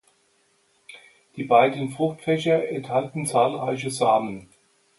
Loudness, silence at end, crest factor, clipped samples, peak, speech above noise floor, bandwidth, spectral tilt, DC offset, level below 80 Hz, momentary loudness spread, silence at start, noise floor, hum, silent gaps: -23 LUFS; 0.55 s; 20 dB; under 0.1%; -4 dBFS; 42 dB; 11.5 kHz; -5 dB/octave; under 0.1%; -68 dBFS; 14 LU; 0.9 s; -65 dBFS; none; none